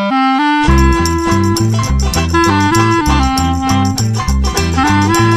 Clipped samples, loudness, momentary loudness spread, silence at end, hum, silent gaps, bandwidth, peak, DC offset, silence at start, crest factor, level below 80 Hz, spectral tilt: under 0.1%; -12 LUFS; 4 LU; 0 s; none; none; 14.5 kHz; 0 dBFS; under 0.1%; 0 s; 12 dB; -18 dBFS; -5 dB/octave